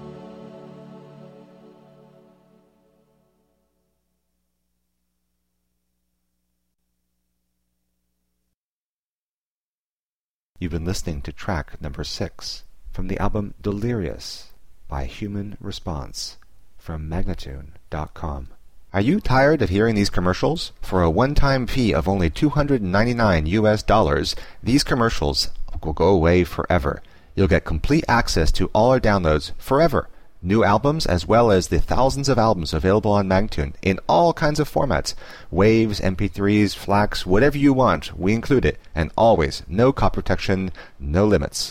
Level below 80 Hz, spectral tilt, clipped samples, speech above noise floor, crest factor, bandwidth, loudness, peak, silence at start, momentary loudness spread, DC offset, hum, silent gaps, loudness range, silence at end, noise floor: -32 dBFS; -6 dB/octave; under 0.1%; over 70 dB; 16 dB; 16 kHz; -20 LUFS; -6 dBFS; 0 s; 15 LU; under 0.1%; 60 Hz at -50 dBFS; 8.56-10.50 s; 12 LU; 0 s; under -90 dBFS